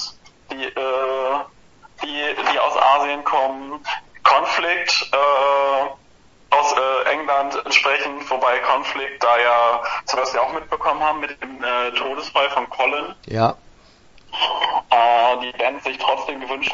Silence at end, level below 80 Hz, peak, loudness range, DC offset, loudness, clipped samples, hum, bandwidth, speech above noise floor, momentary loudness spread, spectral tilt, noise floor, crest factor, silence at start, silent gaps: 0 s; -56 dBFS; 0 dBFS; 3 LU; under 0.1%; -19 LUFS; under 0.1%; none; 7.8 kHz; 30 dB; 12 LU; -2.5 dB/octave; -51 dBFS; 20 dB; 0 s; none